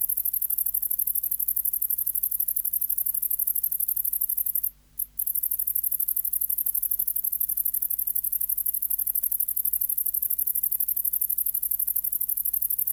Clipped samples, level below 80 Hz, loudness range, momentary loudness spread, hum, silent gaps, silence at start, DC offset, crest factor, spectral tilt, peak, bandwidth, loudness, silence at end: under 0.1%; -58 dBFS; 1 LU; 1 LU; none; none; 0 s; under 0.1%; 20 dB; 0 dB/octave; -6 dBFS; over 20 kHz; -23 LUFS; 0 s